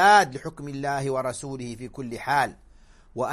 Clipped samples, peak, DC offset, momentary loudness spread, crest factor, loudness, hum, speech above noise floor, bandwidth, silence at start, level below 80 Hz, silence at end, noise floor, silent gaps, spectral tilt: under 0.1%; -4 dBFS; under 0.1%; 15 LU; 20 dB; -26 LUFS; none; 27 dB; 13.5 kHz; 0 s; -54 dBFS; 0 s; -52 dBFS; none; -4 dB/octave